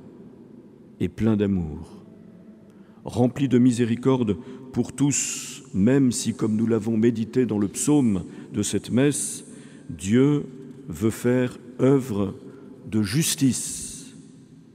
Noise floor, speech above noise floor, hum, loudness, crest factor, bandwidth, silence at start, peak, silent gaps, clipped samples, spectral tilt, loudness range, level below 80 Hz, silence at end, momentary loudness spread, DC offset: -48 dBFS; 26 dB; none; -23 LUFS; 18 dB; 16 kHz; 0 s; -6 dBFS; none; under 0.1%; -5.5 dB/octave; 3 LU; -56 dBFS; 0.2 s; 18 LU; under 0.1%